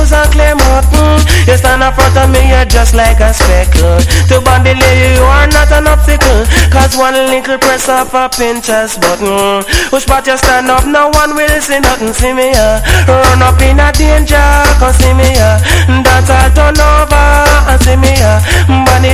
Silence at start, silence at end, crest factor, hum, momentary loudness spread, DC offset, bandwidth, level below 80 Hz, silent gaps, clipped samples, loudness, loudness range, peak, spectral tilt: 0 s; 0 s; 6 dB; none; 4 LU; under 0.1%; 16 kHz; -10 dBFS; none; 2%; -7 LUFS; 2 LU; 0 dBFS; -4.5 dB/octave